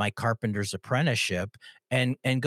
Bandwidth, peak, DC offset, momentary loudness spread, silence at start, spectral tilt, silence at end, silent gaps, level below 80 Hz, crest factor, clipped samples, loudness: 15.5 kHz; -12 dBFS; under 0.1%; 7 LU; 0 s; -5 dB/octave; 0 s; none; -68 dBFS; 16 dB; under 0.1%; -28 LUFS